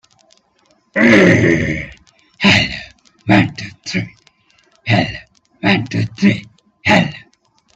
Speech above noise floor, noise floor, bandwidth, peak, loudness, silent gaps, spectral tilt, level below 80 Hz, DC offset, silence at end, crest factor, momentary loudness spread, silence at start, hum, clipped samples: 42 dB; -57 dBFS; 8.4 kHz; 0 dBFS; -14 LUFS; none; -5.5 dB/octave; -44 dBFS; under 0.1%; 0.6 s; 16 dB; 18 LU; 0.95 s; none; under 0.1%